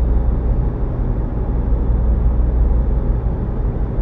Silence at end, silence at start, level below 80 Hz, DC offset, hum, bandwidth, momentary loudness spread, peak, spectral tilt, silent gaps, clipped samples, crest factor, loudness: 0 s; 0 s; -16 dBFS; under 0.1%; none; 2.4 kHz; 4 LU; -4 dBFS; -12 dB/octave; none; under 0.1%; 12 dB; -20 LUFS